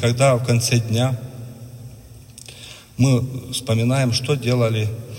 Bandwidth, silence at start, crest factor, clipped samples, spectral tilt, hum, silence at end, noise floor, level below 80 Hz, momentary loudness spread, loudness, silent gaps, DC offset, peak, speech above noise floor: 16.5 kHz; 0 s; 16 dB; under 0.1%; -5.5 dB/octave; none; 0 s; -41 dBFS; -50 dBFS; 21 LU; -19 LUFS; none; under 0.1%; -4 dBFS; 23 dB